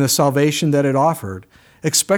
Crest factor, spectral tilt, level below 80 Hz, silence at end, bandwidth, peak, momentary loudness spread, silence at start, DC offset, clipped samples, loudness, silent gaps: 14 dB; -4 dB/octave; -60 dBFS; 0 s; over 20 kHz; -4 dBFS; 14 LU; 0 s; under 0.1%; under 0.1%; -17 LUFS; none